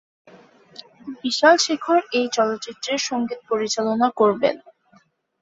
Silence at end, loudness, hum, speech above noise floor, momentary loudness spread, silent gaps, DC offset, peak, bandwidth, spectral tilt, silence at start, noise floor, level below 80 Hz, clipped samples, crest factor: 0.85 s; -20 LUFS; none; 38 dB; 13 LU; none; under 0.1%; -2 dBFS; 8 kHz; -2.5 dB/octave; 1.05 s; -58 dBFS; -70 dBFS; under 0.1%; 20 dB